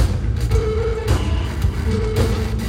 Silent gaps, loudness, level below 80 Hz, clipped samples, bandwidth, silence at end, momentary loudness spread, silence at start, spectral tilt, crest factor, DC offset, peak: none; -20 LUFS; -22 dBFS; under 0.1%; 15.5 kHz; 0 s; 2 LU; 0 s; -6.5 dB/octave; 14 dB; under 0.1%; -6 dBFS